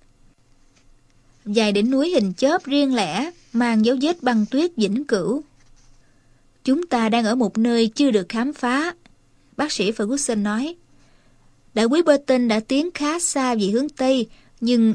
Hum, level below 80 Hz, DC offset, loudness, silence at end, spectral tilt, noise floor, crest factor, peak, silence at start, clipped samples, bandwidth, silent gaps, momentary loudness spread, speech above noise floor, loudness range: none; -56 dBFS; under 0.1%; -21 LUFS; 0 s; -4.5 dB/octave; -55 dBFS; 18 dB; -2 dBFS; 1.45 s; under 0.1%; 13.5 kHz; none; 8 LU; 36 dB; 3 LU